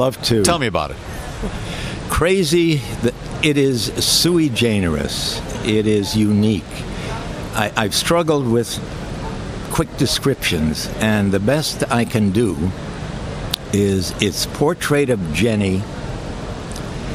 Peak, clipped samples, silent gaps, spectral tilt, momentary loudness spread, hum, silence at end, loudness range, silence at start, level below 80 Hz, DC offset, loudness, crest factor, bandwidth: 0 dBFS; under 0.1%; none; -4.5 dB/octave; 12 LU; none; 0 s; 3 LU; 0 s; -34 dBFS; under 0.1%; -19 LUFS; 18 dB; 16.5 kHz